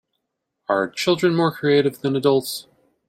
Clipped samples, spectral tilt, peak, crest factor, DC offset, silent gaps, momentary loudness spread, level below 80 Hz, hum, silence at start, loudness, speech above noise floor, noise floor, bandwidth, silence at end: under 0.1%; -5.5 dB/octave; -4 dBFS; 16 dB; under 0.1%; none; 11 LU; -64 dBFS; none; 0.7 s; -20 LUFS; 58 dB; -78 dBFS; 16.5 kHz; 0.45 s